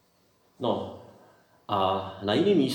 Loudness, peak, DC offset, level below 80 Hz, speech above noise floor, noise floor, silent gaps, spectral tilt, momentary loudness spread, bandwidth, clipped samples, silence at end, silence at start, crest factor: -27 LUFS; -12 dBFS; under 0.1%; -72 dBFS; 40 dB; -65 dBFS; none; -6.5 dB/octave; 13 LU; 18 kHz; under 0.1%; 0 s; 0.6 s; 16 dB